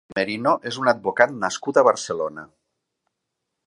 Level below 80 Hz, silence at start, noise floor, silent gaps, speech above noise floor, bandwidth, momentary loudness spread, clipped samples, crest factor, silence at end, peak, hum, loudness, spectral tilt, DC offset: -66 dBFS; 0.1 s; -80 dBFS; none; 59 dB; 11.5 kHz; 10 LU; under 0.1%; 22 dB; 1.2 s; 0 dBFS; none; -21 LUFS; -4 dB/octave; under 0.1%